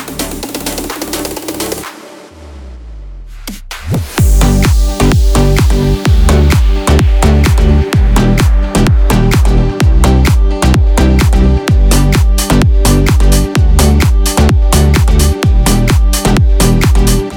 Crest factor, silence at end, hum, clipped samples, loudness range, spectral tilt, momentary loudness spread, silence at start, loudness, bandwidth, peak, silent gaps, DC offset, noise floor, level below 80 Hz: 8 dB; 0 s; none; under 0.1%; 8 LU; -5.5 dB/octave; 10 LU; 0 s; -10 LUFS; over 20 kHz; 0 dBFS; none; under 0.1%; -32 dBFS; -10 dBFS